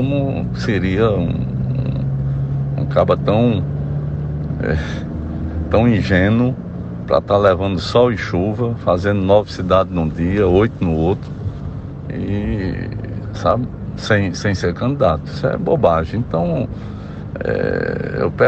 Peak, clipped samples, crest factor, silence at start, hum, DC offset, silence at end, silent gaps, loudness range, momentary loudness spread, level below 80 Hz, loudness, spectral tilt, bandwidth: 0 dBFS; under 0.1%; 16 dB; 0 s; none; under 0.1%; 0 s; none; 4 LU; 11 LU; -32 dBFS; -18 LUFS; -8 dB/octave; 8.2 kHz